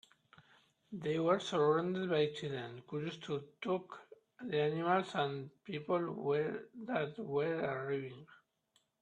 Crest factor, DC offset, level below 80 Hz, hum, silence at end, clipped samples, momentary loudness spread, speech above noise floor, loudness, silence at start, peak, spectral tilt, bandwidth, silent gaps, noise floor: 20 dB; under 0.1%; -80 dBFS; none; 0.65 s; under 0.1%; 13 LU; 41 dB; -37 LUFS; 0.9 s; -18 dBFS; -6.5 dB/octave; 9.8 kHz; none; -78 dBFS